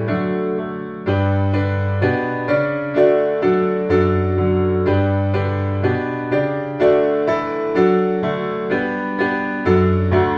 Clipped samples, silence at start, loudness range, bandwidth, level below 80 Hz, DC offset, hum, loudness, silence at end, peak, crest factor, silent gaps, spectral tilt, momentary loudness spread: under 0.1%; 0 s; 1 LU; 6 kHz; -46 dBFS; under 0.1%; none; -18 LUFS; 0 s; -2 dBFS; 14 dB; none; -9.5 dB/octave; 6 LU